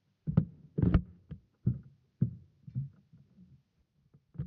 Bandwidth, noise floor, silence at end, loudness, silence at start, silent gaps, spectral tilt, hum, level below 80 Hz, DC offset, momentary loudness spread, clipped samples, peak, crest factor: 4.7 kHz; -73 dBFS; 0 s; -34 LUFS; 0.25 s; none; -10.5 dB/octave; none; -46 dBFS; under 0.1%; 20 LU; under 0.1%; -12 dBFS; 24 dB